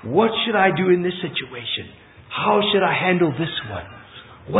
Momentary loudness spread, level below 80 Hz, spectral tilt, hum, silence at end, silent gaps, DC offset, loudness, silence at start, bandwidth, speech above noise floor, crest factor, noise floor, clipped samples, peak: 17 LU; -54 dBFS; -10.5 dB/octave; none; 0 s; none; under 0.1%; -20 LUFS; 0.05 s; 4 kHz; 21 dB; 18 dB; -41 dBFS; under 0.1%; -2 dBFS